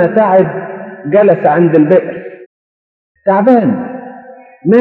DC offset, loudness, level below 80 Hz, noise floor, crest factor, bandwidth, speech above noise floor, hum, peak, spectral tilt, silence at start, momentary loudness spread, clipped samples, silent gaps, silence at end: under 0.1%; -10 LUFS; -62 dBFS; -35 dBFS; 12 dB; 4.7 kHz; 26 dB; none; 0 dBFS; -10.5 dB/octave; 0 s; 17 LU; 0.3%; 2.46-3.15 s; 0 s